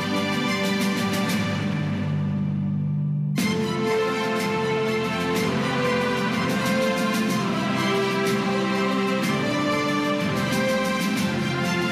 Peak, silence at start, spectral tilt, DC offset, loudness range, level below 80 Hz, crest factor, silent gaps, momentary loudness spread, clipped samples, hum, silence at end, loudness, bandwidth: -12 dBFS; 0 s; -5.5 dB/octave; under 0.1%; 2 LU; -58 dBFS; 12 dB; none; 3 LU; under 0.1%; none; 0 s; -23 LUFS; 15.5 kHz